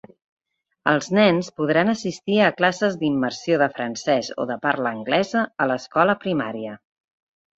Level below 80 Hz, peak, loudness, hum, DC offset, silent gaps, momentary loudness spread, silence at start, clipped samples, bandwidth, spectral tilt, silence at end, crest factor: -64 dBFS; -2 dBFS; -21 LUFS; none; under 0.1%; none; 9 LU; 0.85 s; under 0.1%; 8 kHz; -5 dB/octave; 0.85 s; 20 dB